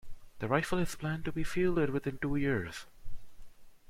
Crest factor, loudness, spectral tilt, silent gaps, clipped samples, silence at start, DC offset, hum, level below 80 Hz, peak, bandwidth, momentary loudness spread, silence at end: 20 dB; -34 LUFS; -6.5 dB/octave; none; under 0.1%; 0.05 s; under 0.1%; none; -48 dBFS; -14 dBFS; 15.5 kHz; 12 LU; 0.15 s